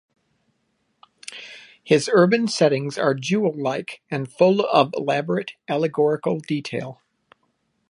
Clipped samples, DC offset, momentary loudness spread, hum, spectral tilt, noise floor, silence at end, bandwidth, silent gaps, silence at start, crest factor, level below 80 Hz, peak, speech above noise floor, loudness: under 0.1%; under 0.1%; 20 LU; none; -5.5 dB/octave; -70 dBFS; 0.95 s; 11.5 kHz; none; 1.3 s; 20 dB; -72 dBFS; -2 dBFS; 50 dB; -21 LUFS